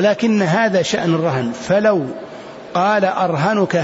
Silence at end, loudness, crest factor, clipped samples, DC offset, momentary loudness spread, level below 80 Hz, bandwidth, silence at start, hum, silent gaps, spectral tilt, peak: 0 s; -17 LUFS; 12 dB; under 0.1%; under 0.1%; 11 LU; -58 dBFS; 8 kHz; 0 s; none; none; -6 dB/octave; -4 dBFS